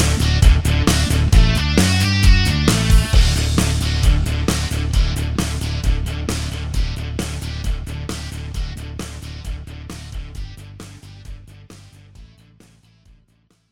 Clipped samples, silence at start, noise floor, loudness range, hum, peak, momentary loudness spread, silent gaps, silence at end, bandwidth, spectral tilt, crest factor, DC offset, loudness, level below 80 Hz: under 0.1%; 0 s; -59 dBFS; 20 LU; none; 0 dBFS; 19 LU; none; 1.45 s; 16.5 kHz; -4.5 dB/octave; 18 dB; under 0.1%; -18 LUFS; -20 dBFS